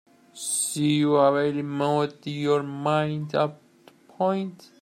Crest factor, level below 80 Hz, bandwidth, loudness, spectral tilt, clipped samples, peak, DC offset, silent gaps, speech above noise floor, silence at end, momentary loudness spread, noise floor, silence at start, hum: 18 dB; -70 dBFS; 15.5 kHz; -25 LUFS; -5 dB/octave; under 0.1%; -8 dBFS; under 0.1%; none; 31 dB; 0.25 s; 9 LU; -55 dBFS; 0.35 s; none